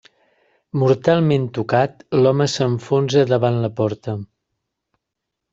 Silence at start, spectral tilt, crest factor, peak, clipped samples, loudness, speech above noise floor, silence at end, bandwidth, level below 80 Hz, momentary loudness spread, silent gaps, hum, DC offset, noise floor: 0.75 s; -6.5 dB/octave; 16 dB; -2 dBFS; under 0.1%; -18 LUFS; 63 dB; 1.3 s; 7.8 kHz; -58 dBFS; 8 LU; none; none; under 0.1%; -81 dBFS